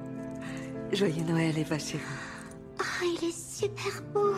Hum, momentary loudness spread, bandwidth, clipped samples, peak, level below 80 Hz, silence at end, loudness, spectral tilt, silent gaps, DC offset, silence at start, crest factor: none; 11 LU; 15 kHz; under 0.1%; -14 dBFS; -60 dBFS; 0 s; -32 LUFS; -5 dB/octave; none; under 0.1%; 0 s; 18 dB